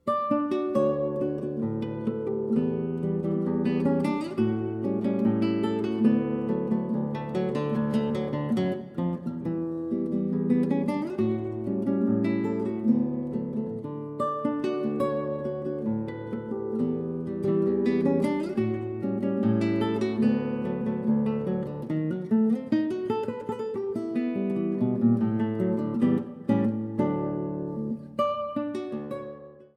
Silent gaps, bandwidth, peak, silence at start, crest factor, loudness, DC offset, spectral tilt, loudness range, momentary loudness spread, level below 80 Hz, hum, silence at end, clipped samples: none; 9 kHz; -10 dBFS; 0.05 s; 16 dB; -28 LUFS; under 0.1%; -9 dB/octave; 3 LU; 7 LU; -60 dBFS; none; 0.1 s; under 0.1%